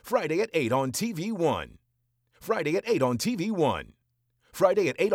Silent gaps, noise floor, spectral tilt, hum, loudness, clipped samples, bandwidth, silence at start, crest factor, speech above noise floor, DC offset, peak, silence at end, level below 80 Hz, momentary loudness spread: none; -74 dBFS; -5 dB/octave; none; -27 LUFS; under 0.1%; 17.5 kHz; 0.05 s; 20 dB; 48 dB; under 0.1%; -8 dBFS; 0 s; -62 dBFS; 9 LU